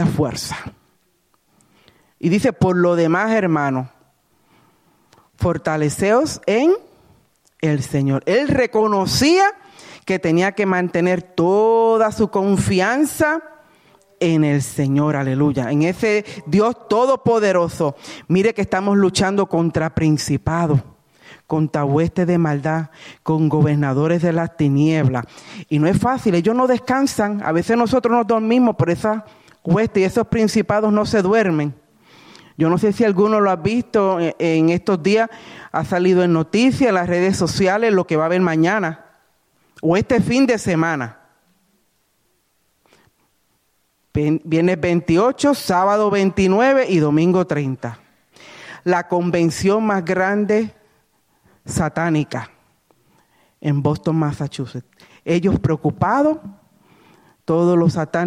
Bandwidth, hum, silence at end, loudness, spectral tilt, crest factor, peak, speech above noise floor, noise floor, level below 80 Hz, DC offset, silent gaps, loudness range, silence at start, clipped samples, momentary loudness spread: 15.5 kHz; none; 0 s; -18 LUFS; -6.5 dB/octave; 14 dB; -4 dBFS; 48 dB; -65 dBFS; -48 dBFS; under 0.1%; none; 5 LU; 0 s; under 0.1%; 9 LU